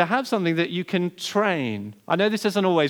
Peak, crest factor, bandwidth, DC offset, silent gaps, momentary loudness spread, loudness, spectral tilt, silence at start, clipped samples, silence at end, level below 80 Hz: -4 dBFS; 18 dB; over 20 kHz; under 0.1%; none; 5 LU; -23 LUFS; -5.5 dB/octave; 0 s; under 0.1%; 0 s; -80 dBFS